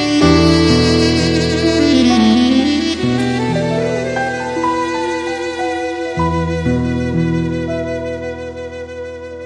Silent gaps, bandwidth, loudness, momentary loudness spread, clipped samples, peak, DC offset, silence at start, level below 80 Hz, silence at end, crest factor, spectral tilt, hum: none; 10.5 kHz; -15 LUFS; 13 LU; under 0.1%; 0 dBFS; under 0.1%; 0 s; -32 dBFS; 0 s; 14 dB; -5.5 dB/octave; none